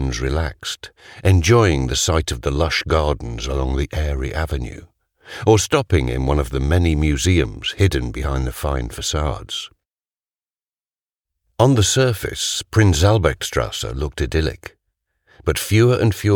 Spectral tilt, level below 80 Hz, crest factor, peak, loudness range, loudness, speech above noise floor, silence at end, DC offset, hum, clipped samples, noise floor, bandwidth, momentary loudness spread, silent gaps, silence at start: -5 dB/octave; -28 dBFS; 18 dB; 0 dBFS; 5 LU; -19 LUFS; over 72 dB; 0 s; under 0.1%; none; under 0.1%; under -90 dBFS; 18.5 kHz; 11 LU; 11.03-11.07 s; 0 s